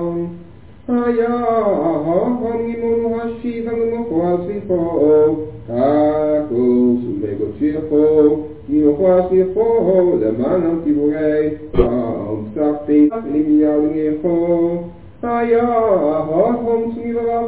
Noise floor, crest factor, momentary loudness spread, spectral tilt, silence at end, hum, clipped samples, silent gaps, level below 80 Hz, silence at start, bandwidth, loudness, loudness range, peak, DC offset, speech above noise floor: -40 dBFS; 16 dB; 8 LU; -12.5 dB/octave; 0 s; none; under 0.1%; none; -40 dBFS; 0 s; 4 kHz; -17 LUFS; 3 LU; 0 dBFS; 0.7%; 24 dB